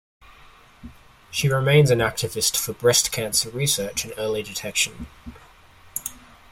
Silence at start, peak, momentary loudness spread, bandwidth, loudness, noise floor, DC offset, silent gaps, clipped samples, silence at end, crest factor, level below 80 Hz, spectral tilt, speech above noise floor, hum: 0.85 s; -4 dBFS; 14 LU; 16.5 kHz; -21 LUFS; -50 dBFS; under 0.1%; none; under 0.1%; 0.35 s; 20 dB; -50 dBFS; -3.5 dB/octave; 28 dB; none